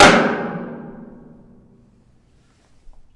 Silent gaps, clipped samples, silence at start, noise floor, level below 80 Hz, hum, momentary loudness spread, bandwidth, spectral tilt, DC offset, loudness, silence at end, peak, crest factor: none; under 0.1%; 0 s; -55 dBFS; -44 dBFS; none; 27 LU; 12 kHz; -3.5 dB/octave; under 0.1%; -17 LUFS; 2.1 s; 0 dBFS; 20 dB